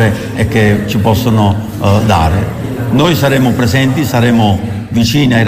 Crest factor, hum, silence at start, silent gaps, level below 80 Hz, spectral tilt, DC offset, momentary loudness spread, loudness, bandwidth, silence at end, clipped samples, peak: 10 dB; none; 0 s; none; -30 dBFS; -6 dB/octave; under 0.1%; 6 LU; -11 LUFS; 16 kHz; 0 s; under 0.1%; 0 dBFS